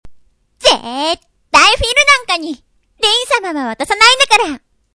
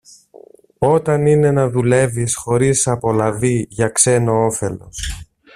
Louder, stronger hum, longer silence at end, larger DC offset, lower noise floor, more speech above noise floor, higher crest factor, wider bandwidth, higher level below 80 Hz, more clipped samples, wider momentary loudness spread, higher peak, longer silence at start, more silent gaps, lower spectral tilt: first, -11 LUFS vs -16 LUFS; neither; about the same, 0.35 s vs 0.35 s; neither; about the same, -45 dBFS vs -44 dBFS; about the same, 31 dB vs 28 dB; about the same, 14 dB vs 16 dB; second, 11 kHz vs 14.5 kHz; about the same, -36 dBFS vs -40 dBFS; first, 0.3% vs under 0.1%; about the same, 13 LU vs 12 LU; about the same, 0 dBFS vs 0 dBFS; second, 0.05 s vs 0.35 s; neither; second, -1 dB/octave vs -5 dB/octave